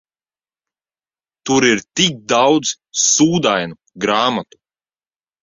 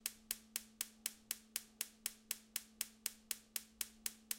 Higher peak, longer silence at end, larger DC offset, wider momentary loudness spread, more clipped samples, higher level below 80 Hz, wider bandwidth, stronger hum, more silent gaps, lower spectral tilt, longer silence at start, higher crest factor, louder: first, -2 dBFS vs -16 dBFS; first, 1 s vs 0 s; neither; first, 10 LU vs 3 LU; neither; first, -56 dBFS vs -78 dBFS; second, 7.8 kHz vs 17 kHz; neither; neither; first, -3 dB/octave vs 1.5 dB/octave; first, 1.45 s vs 0 s; second, 18 dB vs 32 dB; first, -15 LUFS vs -45 LUFS